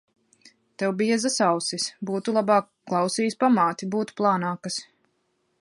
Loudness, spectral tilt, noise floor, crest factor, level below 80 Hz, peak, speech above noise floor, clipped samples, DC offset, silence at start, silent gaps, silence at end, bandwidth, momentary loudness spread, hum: -24 LUFS; -4 dB/octave; -72 dBFS; 18 dB; -76 dBFS; -6 dBFS; 48 dB; under 0.1%; under 0.1%; 0.8 s; none; 0.8 s; 11.5 kHz; 8 LU; none